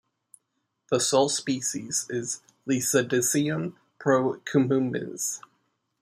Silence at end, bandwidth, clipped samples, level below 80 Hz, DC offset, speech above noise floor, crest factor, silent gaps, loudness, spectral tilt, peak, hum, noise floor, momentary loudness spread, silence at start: 0.65 s; 15.5 kHz; under 0.1%; -72 dBFS; under 0.1%; 53 dB; 18 dB; none; -26 LUFS; -4 dB/octave; -8 dBFS; none; -78 dBFS; 9 LU; 0.9 s